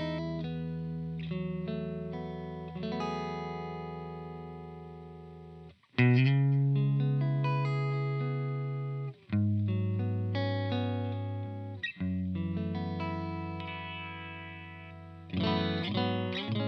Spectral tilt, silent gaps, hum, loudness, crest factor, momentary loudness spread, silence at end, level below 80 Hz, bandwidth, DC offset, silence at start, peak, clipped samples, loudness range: -8.5 dB/octave; none; none; -33 LUFS; 18 dB; 16 LU; 0 s; -60 dBFS; 6.2 kHz; under 0.1%; 0 s; -14 dBFS; under 0.1%; 9 LU